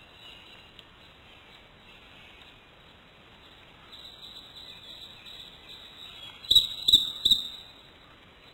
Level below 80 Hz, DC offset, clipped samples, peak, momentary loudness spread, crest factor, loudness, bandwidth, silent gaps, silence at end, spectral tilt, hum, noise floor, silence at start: -58 dBFS; under 0.1%; under 0.1%; -6 dBFS; 28 LU; 26 dB; -21 LUFS; 17 kHz; none; 0.9 s; -0.5 dB/octave; none; -54 dBFS; 0.25 s